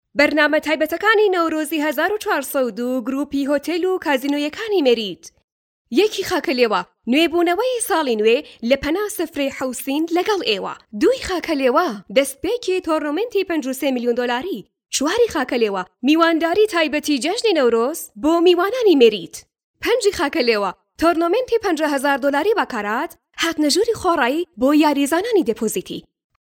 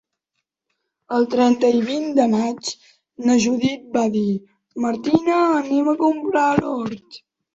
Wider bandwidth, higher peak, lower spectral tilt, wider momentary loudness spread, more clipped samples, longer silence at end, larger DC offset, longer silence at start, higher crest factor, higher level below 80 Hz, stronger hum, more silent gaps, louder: first, 19 kHz vs 8 kHz; about the same, 0 dBFS vs 0 dBFS; second, -3 dB/octave vs -5 dB/octave; second, 8 LU vs 11 LU; neither; about the same, 0.45 s vs 0.4 s; neither; second, 0.15 s vs 1.1 s; about the same, 18 dB vs 20 dB; first, -52 dBFS vs -58 dBFS; neither; first, 5.44-5.85 s, 19.64-19.74 s vs none; about the same, -19 LUFS vs -19 LUFS